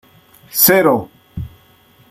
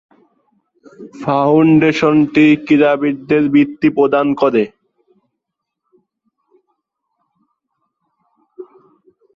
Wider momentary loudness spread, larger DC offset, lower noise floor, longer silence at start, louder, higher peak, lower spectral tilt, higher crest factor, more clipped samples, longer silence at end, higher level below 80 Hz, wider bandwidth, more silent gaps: first, 22 LU vs 7 LU; neither; second, -50 dBFS vs -78 dBFS; second, 0.55 s vs 1 s; about the same, -13 LUFS vs -13 LUFS; about the same, 0 dBFS vs -2 dBFS; second, -3.5 dB/octave vs -7.5 dB/octave; about the same, 18 dB vs 14 dB; neither; about the same, 0.65 s vs 0.7 s; first, -46 dBFS vs -56 dBFS; first, 16.5 kHz vs 7.2 kHz; neither